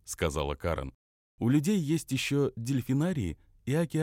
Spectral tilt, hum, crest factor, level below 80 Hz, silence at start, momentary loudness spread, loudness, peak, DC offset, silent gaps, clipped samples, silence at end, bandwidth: -6 dB/octave; none; 16 dB; -48 dBFS; 0.05 s; 9 LU; -30 LUFS; -14 dBFS; under 0.1%; 0.95-1.38 s; under 0.1%; 0 s; 16.5 kHz